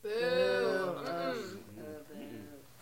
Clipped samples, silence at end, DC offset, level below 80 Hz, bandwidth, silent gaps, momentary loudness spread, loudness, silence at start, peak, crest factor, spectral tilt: under 0.1%; 0 s; under 0.1%; -74 dBFS; 16.5 kHz; none; 18 LU; -33 LUFS; 0.05 s; -20 dBFS; 14 dB; -5 dB/octave